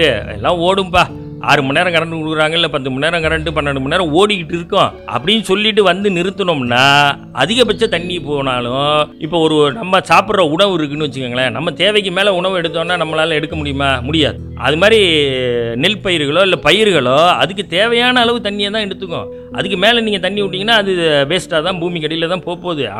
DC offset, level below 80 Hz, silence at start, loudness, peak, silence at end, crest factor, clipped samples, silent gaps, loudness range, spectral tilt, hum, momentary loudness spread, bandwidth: under 0.1%; -40 dBFS; 0 s; -13 LUFS; 0 dBFS; 0 s; 14 dB; under 0.1%; none; 3 LU; -4.5 dB/octave; none; 8 LU; 16 kHz